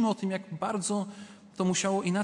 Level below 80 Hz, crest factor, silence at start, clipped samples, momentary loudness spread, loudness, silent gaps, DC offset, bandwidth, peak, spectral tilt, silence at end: -74 dBFS; 14 dB; 0 s; under 0.1%; 14 LU; -30 LUFS; none; under 0.1%; 11.5 kHz; -16 dBFS; -4.5 dB/octave; 0 s